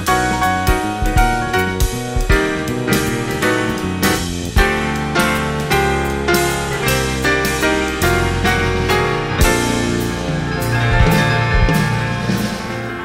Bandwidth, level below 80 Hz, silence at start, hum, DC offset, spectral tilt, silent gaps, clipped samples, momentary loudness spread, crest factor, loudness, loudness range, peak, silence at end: 16.5 kHz; -24 dBFS; 0 s; none; under 0.1%; -4.5 dB/octave; none; under 0.1%; 5 LU; 16 dB; -16 LUFS; 1 LU; 0 dBFS; 0 s